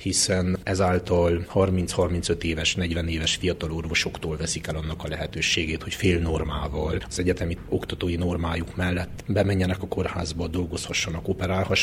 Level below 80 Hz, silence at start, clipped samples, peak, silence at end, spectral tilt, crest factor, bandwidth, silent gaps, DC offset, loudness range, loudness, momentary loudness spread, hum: -38 dBFS; 0 s; under 0.1%; -8 dBFS; 0 s; -4.5 dB/octave; 18 dB; 16 kHz; none; under 0.1%; 3 LU; -25 LUFS; 6 LU; none